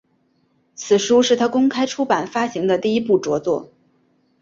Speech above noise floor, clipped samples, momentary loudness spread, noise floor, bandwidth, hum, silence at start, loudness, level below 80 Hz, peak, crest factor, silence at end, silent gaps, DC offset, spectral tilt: 45 dB; under 0.1%; 8 LU; -63 dBFS; 7.8 kHz; none; 0.8 s; -19 LUFS; -62 dBFS; -2 dBFS; 16 dB; 0.75 s; none; under 0.1%; -4 dB/octave